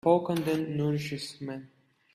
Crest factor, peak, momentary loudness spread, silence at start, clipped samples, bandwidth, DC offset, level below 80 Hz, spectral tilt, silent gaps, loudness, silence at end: 20 dB; -10 dBFS; 14 LU; 0.05 s; under 0.1%; 15 kHz; under 0.1%; -66 dBFS; -6.5 dB/octave; none; -30 LUFS; 0.5 s